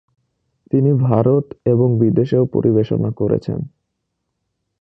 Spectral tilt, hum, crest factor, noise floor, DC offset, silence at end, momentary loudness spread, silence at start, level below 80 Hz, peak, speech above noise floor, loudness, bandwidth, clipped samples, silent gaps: -11.5 dB/octave; none; 16 dB; -74 dBFS; under 0.1%; 1.15 s; 6 LU; 0.75 s; -50 dBFS; 0 dBFS; 59 dB; -17 LUFS; 5.4 kHz; under 0.1%; none